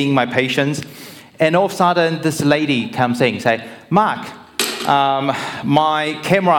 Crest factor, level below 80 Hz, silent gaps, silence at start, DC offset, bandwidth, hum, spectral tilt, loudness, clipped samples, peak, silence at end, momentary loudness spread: 16 dB; -58 dBFS; none; 0 s; under 0.1%; 18.5 kHz; none; -5 dB/octave; -17 LUFS; under 0.1%; -2 dBFS; 0 s; 8 LU